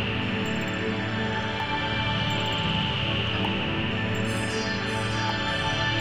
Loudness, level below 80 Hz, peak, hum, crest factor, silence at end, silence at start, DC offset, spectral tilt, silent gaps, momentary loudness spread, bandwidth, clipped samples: -26 LUFS; -44 dBFS; -14 dBFS; none; 14 dB; 0 s; 0 s; under 0.1%; -5 dB/octave; none; 3 LU; 15.5 kHz; under 0.1%